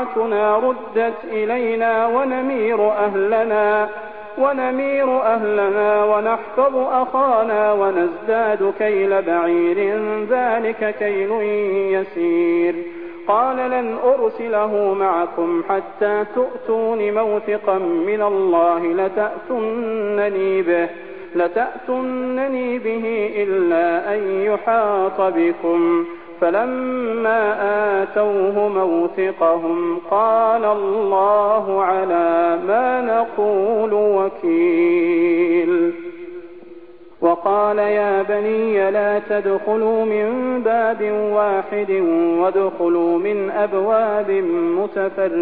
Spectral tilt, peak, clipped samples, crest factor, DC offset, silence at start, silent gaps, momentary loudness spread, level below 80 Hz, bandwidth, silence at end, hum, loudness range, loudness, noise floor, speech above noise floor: -10 dB/octave; -4 dBFS; under 0.1%; 14 dB; 0.5%; 0 s; none; 5 LU; -60 dBFS; 4.4 kHz; 0 s; none; 3 LU; -18 LUFS; -41 dBFS; 24 dB